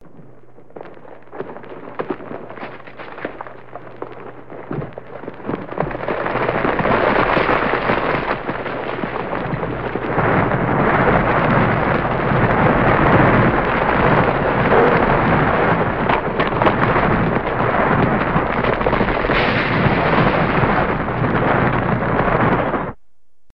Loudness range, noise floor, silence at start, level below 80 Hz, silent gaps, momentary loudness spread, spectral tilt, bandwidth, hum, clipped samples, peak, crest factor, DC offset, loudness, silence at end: 16 LU; -67 dBFS; 0.2 s; -34 dBFS; none; 18 LU; -9.5 dB/octave; 5.8 kHz; none; under 0.1%; 0 dBFS; 18 dB; 1%; -17 LUFS; 0 s